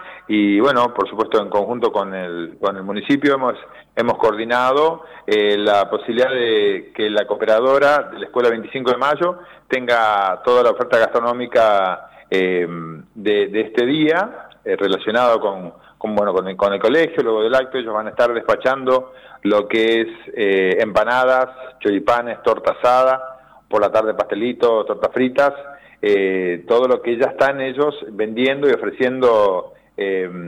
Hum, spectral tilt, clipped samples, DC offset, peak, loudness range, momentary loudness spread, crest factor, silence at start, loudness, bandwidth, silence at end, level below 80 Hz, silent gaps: none; -5.5 dB/octave; under 0.1%; under 0.1%; -6 dBFS; 2 LU; 9 LU; 12 dB; 0 s; -18 LUFS; 12 kHz; 0 s; -58 dBFS; none